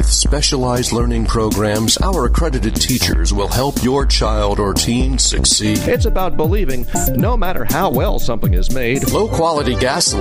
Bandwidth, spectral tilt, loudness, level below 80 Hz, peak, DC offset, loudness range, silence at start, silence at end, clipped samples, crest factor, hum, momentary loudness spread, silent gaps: 16 kHz; -4 dB/octave; -16 LUFS; -20 dBFS; 0 dBFS; under 0.1%; 2 LU; 0 s; 0 s; under 0.1%; 14 dB; none; 4 LU; none